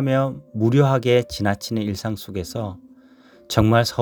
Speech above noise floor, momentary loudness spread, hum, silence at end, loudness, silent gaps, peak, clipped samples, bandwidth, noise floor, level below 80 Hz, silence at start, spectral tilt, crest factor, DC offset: 30 dB; 12 LU; none; 0 s; -21 LUFS; none; 0 dBFS; under 0.1%; 19.5 kHz; -50 dBFS; -44 dBFS; 0 s; -6.5 dB/octave; 20 dB; under 0.1%